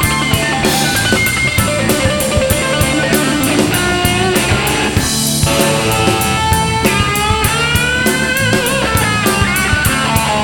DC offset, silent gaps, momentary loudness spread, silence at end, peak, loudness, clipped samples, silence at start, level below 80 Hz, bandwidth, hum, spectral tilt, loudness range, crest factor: under 0.1%; none; 1 LU; 0 s; 0 dBFS; -12 LUFS; under 0.1%; 0 s; -28 dBFS; over 20 kHz; none; -3.5 dB/octave; 0 LU; 14 dB